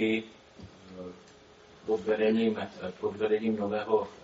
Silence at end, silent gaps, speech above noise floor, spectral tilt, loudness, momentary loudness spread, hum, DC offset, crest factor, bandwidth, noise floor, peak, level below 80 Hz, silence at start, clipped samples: 0 s; none; 26 dB; -4.5 dB/octave; -30 LUFS; 22 LU; none; under 0.1%; 18 dB; 7.6 kHz; -55 dBFS; -14 dBFS; -68 dBFS; 0 s; under 0.1%